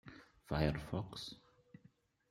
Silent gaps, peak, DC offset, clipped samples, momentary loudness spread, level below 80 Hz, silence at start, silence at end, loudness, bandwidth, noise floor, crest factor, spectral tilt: none; -20 dBFS; under 0.1%; under 0.1%; 22 LU; -56 dBFS; 0.05 s; 0.9 s; -41 LUFS; 13 kHz; -70 dBFS; 24 dB; -6.5 dB/octave